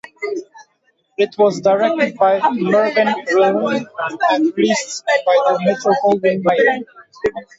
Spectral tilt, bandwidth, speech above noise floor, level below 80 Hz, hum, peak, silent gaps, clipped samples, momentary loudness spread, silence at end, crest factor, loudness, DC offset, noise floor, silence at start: -4.5 dB/octave; 8 kHz; 47 dB; -60 dBFS; none; -2 dBFS; none; under 0.1%; 11 LU; 0.15 s; 14 dB; -16 LUFS; under 0.1%; -62 dBFS; 0.2 s